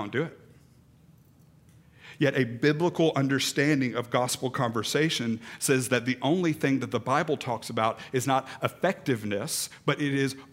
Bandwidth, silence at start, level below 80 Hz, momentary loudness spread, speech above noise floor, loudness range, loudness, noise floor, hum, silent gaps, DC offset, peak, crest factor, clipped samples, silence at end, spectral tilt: 16 kHz; 0 s; -70 dBFS; 6 LU; 30 dB; 2 LU; -27 LUFS; -57 dBFS; none; none; under 0.1%; -8 dBFS; 20 dB; under 0.1%; 0.05 s; -4.5 dB/octave